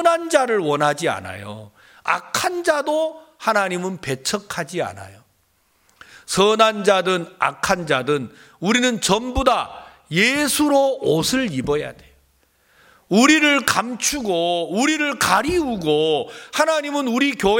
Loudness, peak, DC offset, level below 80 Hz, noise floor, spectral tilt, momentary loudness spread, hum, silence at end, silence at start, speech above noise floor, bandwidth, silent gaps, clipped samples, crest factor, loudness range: -19 LUFS; 0 dBFS; under 0.1%; -44 dBFS; -63 dBFS; -3.5 dB/octave; 11 LU; none; 0 s; 0 s; 43 dB; 17 kHz; none; under 0.1%; 20 dB; 5 LU